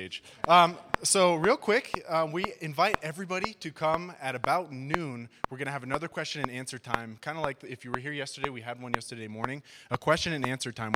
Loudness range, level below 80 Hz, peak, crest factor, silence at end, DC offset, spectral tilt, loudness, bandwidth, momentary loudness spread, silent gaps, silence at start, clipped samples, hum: 9 LU; -58 dBFS; -4 dBFS; 26 dB; 0 s; under 0.1%; -3.5 dB/octave; -29 LUFS; 17 kHz; 14 LU; none; 0 s; under 0.1%; none